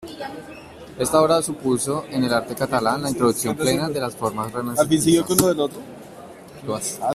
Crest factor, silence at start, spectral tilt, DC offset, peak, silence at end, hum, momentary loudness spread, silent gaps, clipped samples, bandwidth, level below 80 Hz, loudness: 22 dB; 0 s; -4.5 dB/octave; under 0.1%; 0 dBFS; 0 s; none; 22 LU; none; under 0.1%; 16 kHz; -54 dBFS; -21 LUFS